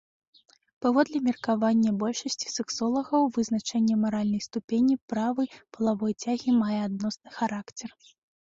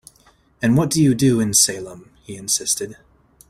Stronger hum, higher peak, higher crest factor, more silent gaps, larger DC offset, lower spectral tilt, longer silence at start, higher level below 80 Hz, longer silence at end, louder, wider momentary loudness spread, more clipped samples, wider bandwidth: neither; second, -10 dBFS vs -2 dBFS; about the same, 18 dB vs 20 dB; first, 4.64-4.68 s, 5.01-5.08 s vs none; neither; about the same, -5 dB/octave vs -4 dB/octave; first, 0.8 s vs 0.6 s; second, -68 dBFS vs -52 dBFS; about the same, 0.6 s vs 0.55 s; second, -27 LUFS vs -17 LUFS; second, 7 LU vs 18 LU; neither; second, 7.8 kHz vs 16 kHz